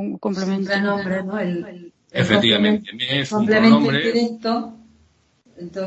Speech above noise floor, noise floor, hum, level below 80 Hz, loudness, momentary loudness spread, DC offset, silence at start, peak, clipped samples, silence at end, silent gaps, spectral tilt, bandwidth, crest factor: 40 dB; -59 dBFS; none; -58 dBFS; -19 LUFS; 15 LU; under 0.1%; 0 s; 0 dBFS; under 0.1%; 0 s; none; -6 dB/octave; 8.2 kHz; 20 dB